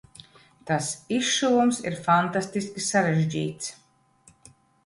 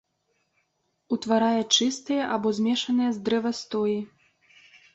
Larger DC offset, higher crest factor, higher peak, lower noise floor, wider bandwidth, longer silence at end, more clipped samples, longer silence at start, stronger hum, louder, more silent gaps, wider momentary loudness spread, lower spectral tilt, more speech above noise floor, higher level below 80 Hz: neither; about the same, 18 dB vs 20 dB; about the same, -8 dBFS vs -8 dBFS; second, -59 dBFS vs -74 dBFS; first, 11.5 kHz vs 8.2 kHz; first, 1.1 s vs 0.9 s; neither; second, 0.65 s vs 1.1 s; neither; about the same, -25 LUFS vs -25 LUFS; neither; about the same, 10 LU vs 9 LU; about the same, -4 dB/octave vs -3.5 dB/octave; second, 35 dB vs 50 dB; first, -64 dBFS vs -70 dBFS